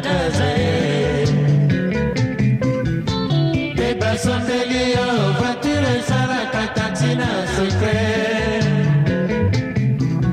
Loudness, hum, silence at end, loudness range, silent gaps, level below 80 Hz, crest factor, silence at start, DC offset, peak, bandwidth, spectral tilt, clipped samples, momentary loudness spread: -19 LUFS; none; 0 s; 1 LU; none; -36 dBFS; 12 dB; 0 s; under 0.1%; -4 dBFS; 11 kHz; -6 dB/octave; under 0.1%; 3 LU